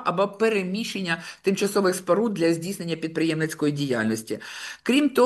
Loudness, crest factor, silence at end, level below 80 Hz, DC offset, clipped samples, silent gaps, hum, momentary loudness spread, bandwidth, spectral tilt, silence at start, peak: -25 LUFS; 16 dB; 0 s; -70 dBFS; under 0.1%; under 0.1%; none; none; 8 LU; 12.5 kHz; -5 dB/octave; 0 s; -8 dBFS